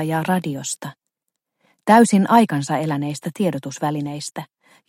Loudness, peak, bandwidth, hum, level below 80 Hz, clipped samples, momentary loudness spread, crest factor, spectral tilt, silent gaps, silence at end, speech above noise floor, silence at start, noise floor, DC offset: -19 LUFS; 0 dBFS; 16.5 kHz; none; -66 dBFS; under 0.1%; 16 LU; 20 dB; -5.5 dB/octave; none; 0.45 s; 61 dB; 0 s; -80 dBFS; under 0.1%